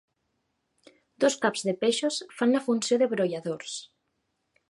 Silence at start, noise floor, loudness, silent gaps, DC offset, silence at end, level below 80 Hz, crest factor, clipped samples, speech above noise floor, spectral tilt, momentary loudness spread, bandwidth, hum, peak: 1.2 s; -77 dBFS; -27 LUFS; none; under 0.1%; 0.85 s; -80 dBFS; 20 dB; under 0.1%; 51 dB; -3.5 dB/octave; 10 LU; 11.5 kHz; none; -8 dBFS